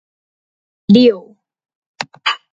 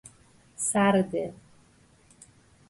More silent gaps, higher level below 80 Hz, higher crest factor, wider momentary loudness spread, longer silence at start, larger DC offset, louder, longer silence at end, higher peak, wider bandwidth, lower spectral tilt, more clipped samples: first, 1.75-1.94 s vs none; about the same, -60 dBFS vs -64 dBFS; about the same, 16 dB vs 20 dB; first, 18 LU vs 11 LU; first, 0.9 s vs 0.6 s; neither; first, -13 LUFS vs -26 LUFS; second, 0.15 s vs 1.35 s; first, 0 dBFS vs -10 dBFS; second, 7.8 kHz vs 11.5 kHz; first, -6.5 dB/octave vs -4.5 dB/octave; neither